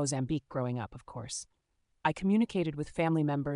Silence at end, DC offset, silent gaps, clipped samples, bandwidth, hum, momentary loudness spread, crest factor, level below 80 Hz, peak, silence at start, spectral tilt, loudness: 0 s; under 0.1%; none; under 0.1%; 11 kHz; none; 12 LU; 20 dB; -58 dBFS; -12 dBFS; 0 s; -6 dB/octave; -32 LUFS